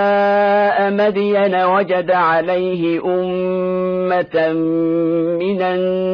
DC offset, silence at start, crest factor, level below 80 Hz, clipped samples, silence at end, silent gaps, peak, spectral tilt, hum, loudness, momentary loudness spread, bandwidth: under 0.1%; 0 s; 10 dB; -56 dBFS; under 0.1%; 0 s; none; -4 dBFS; -8.5 dB/octave; none; -16 LUFS; 5 LU; 5.4 kHz